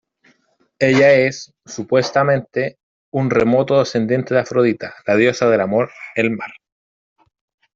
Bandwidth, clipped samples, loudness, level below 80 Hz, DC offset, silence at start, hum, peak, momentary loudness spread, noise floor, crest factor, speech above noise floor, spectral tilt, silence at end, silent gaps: 7.6 kHz; under 0.1%; -17 LUFS; -56 dBFS; under 0.1%; 0.8 s; none; -2 dBFS; 13 LU; -61 dBFS; 16 dB; 45 dB; -6 dB/octave; 1.25 s; 2.83-3.12 s